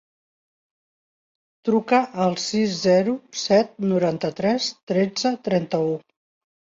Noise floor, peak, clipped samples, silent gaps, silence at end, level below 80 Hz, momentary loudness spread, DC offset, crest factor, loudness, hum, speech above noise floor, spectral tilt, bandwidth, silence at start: under -90 dBFS; -6 dBFS; under 0.1%; 4.83-4.87 s; 0.7 s; -66 dBFS; 6 LU; under 0.1%; 18 dB; -22 LUFS; none; over 69 dB; -5 dB/octave; 7.8 kHz; 1.65 s